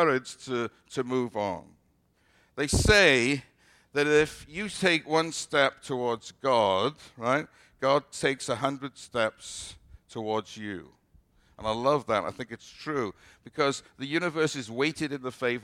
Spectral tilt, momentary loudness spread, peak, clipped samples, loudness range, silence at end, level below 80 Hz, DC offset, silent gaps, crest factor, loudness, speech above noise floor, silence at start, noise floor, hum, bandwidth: -4 dB/octave; 15 LU; -8 dBFS; under 0.1%; 8 LU; 0 s; -48 dBFS; under 0.1%; none; 22 dB; -28 LUFS; 40 dB; 0 s; -68 dBFS; none; 15 kHz